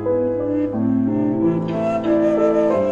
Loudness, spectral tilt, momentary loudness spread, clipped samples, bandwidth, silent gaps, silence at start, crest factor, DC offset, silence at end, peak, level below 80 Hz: -19 LUFS; -9 dB/octave; 4 LU; under 0.1%; 7.4 kHz; none; 0 s; 12 dB; 0.2%; 0 s; -6 dBFS; -50 dBFS